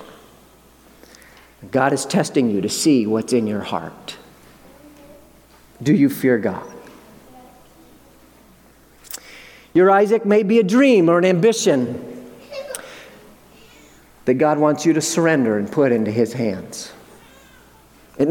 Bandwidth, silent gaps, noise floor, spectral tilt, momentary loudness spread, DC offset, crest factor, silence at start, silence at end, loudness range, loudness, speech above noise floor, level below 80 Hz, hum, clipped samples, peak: 18 kHz; none; -50 dBFS; -5.5 dB/octave; 21 LU; under 0.1%; 18 dB; 0 s; 0 s; 7 LU; -17 LUFS; 33 dB; -58 dBFS; none; under 0.1%; -2 dBFS